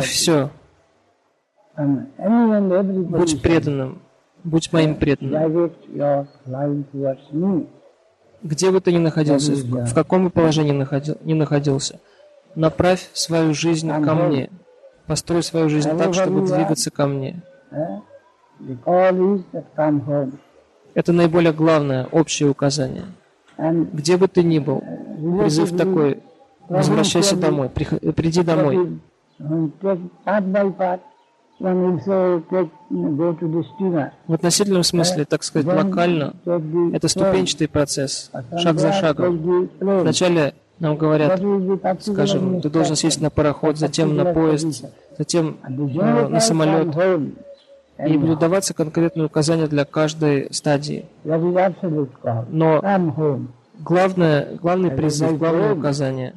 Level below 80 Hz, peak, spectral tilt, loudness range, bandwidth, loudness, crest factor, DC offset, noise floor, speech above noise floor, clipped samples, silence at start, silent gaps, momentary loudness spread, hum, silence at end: -50 dBFS; -2 dBFS; -5.5 dB/octave; 3 LU; 13 kHz; -19 LUFS; 18 dB; under 0.1%; -64 dBFS; 45 dB; under 0.1%; 0 s; none; 10 LU; none; 0.05 s